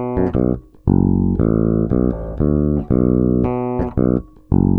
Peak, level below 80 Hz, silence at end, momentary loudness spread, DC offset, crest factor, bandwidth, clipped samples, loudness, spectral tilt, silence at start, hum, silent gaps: -2 dBFS; -28 dBFS; 0 s; 5 LU; under 0.1%; 16 dB; 3 kHz; under 0.1%; -18 LUFS; -13 dB/octave; 0 s; none; none